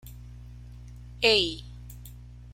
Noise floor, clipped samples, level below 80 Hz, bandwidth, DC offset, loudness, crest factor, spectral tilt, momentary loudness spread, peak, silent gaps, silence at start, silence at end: -45 dBFS; under 0.1%; -46 dBFS; 16.5 kHz; under 0.1%; -23 LUFS; 26 dB; -3.5 dB/octave; 25 LU; -6 dBFS; none; 0.05 s; 0 s